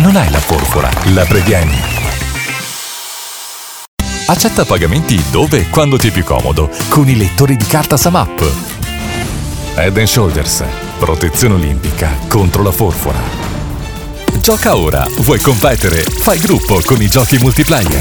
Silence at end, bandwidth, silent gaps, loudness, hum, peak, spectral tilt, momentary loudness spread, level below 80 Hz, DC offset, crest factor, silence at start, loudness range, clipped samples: 0 s; over 20 kHz; 3.88-3.97 s; -11 LUFS; none; 0 dBFS; -5 dB/octave; 11 LU; -20 dBFS; under 0.1%; 12 dB; 0 s; 4 LU; 0.1%